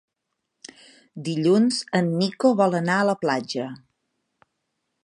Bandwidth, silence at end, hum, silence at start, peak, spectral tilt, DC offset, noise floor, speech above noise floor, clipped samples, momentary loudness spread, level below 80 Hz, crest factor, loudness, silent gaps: 11.5 kHz; 1.3 s; none; 1.15 s; -6 dBFS; -5.5 dB/octave; under 0.1%; -80 dBFS; 58 dB; under 0.1%; 15 LU; -72 dBFS; 18 dB; -22 LUFS; none